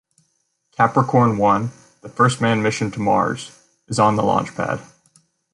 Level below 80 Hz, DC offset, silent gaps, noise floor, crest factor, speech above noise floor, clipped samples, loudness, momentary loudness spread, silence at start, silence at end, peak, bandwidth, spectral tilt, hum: -54 dBFS; under 0.1%; none; -69 dBFS; 18 dB; 50 dB; under 0.1%; -19 LUFS; 14 LU; 0.8 s; 0.7 s; -2 dBFS; 11.5 kHz; -6 dB/octave; none